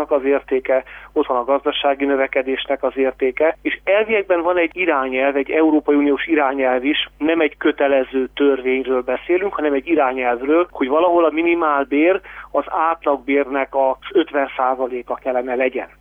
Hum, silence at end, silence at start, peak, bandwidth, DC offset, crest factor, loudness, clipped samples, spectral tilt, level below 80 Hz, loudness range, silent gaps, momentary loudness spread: none; 0.15 s; 0 s; -4 dBFS; 3.8 kHz; under 0.1%; 14 dB; -18 LUFS; under 0.1%; -6.5 dB/octave; -52 dBFS; 2 LU; none; 5 LU